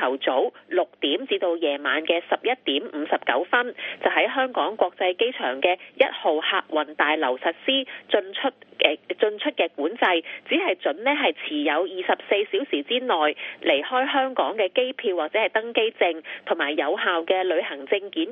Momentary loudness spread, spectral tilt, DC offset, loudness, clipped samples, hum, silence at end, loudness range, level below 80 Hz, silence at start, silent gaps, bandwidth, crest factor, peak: 4 LU; 1.5 dB/octave; under 0.1%; -24 LUFS; under 0.1%; none; 0 s; 1 LU; -78 dBFS; 0 s; none; 4 kHz; 24 dB; 0 dBFS